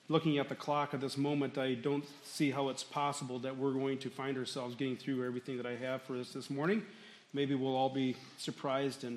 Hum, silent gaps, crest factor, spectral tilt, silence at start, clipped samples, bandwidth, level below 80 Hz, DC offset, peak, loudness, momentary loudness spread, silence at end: none; none; 18 dB; -5.5 dB/octave; 0.1 s; under 0.1%; 13.5 kHz; -84 dBFS; under 0.1%; -18 dBFS; -37 LUFS; 7 LU; 0 s